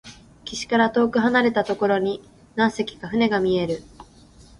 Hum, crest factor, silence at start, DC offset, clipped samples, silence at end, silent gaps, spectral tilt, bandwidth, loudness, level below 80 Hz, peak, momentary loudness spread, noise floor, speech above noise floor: none; 18 dB; 0.05 s; under 0.1%; under 0.1%; 0.55 s; none; -5 dB/octave; 11 kHz; -22 LUFS; -54 dBFS; -6 dBFS; 14 LU; -49 dBFS; 28 dB